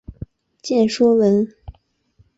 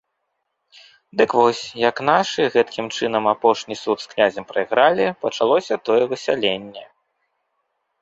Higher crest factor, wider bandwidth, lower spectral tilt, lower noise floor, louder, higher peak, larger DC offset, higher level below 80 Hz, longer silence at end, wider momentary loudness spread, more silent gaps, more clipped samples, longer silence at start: about the same, 14 dB vs 18 dB; about the same, 8 kHz vs 8 kHz; first, -6 dB/octave vs -4 dB/octave; second, -58 dBFS vs -75 dBFS; about the same, -17 LUFS vs -19 LUFS; about the same, -4 dBFS vs -2 dBFS; neither; first, -46 dBFS vs -64 dBFS; second, 0.65 s vs 1.15 s; first, 24 LU vs 8 LU; neither; neither; second, 0.1 s vs 1.15 s